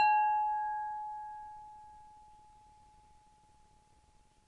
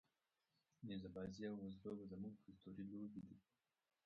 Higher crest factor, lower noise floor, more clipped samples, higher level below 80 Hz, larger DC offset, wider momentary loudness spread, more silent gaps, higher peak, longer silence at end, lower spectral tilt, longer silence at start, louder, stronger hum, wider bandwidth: about the same, 18 dB vs 16 dB; second, -66 dBFS vs -90 dBFS; neither; first, -70 dBFS vs -78 dBFS; neither; first, 26 LU vs 10 LU; neither; first, -18 dBFS vs -38 dBFS; first, 2.35 s vs 0.65 s; second, -2 dB/octave vs -7 dB/octave; second, 0 s vs 0.8 s; first, -34 LUFS vs -54 LUFS; neither; first, 7.8 kHz vs 6.6 kHz